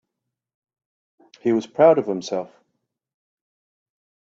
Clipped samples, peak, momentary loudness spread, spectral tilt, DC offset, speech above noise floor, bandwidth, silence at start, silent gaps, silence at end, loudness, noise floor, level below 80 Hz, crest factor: under 0.1%; -2 dBFS; 13 LU; -6 dB/octave; under 0.1%; 63 dB; 7.6 kHz; 1.45 s; none; 1.8 s; -20 LUFS; -82 dBFS; -72 dBFS; 22 dB